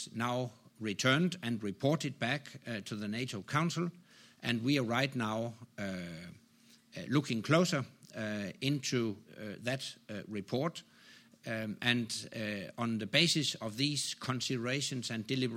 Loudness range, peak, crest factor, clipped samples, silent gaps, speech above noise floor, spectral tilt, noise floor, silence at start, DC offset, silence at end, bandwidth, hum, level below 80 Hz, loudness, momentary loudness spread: 5 LU; -12 dBFS; 24 dB; under 0.1%; none; 29 dB; -4.5 dB/octave; -64 dBFS; 0 s; under 0.1%; 0 s; 16 kHz; none; -76 dBFS; -34 LUFS; 13 LU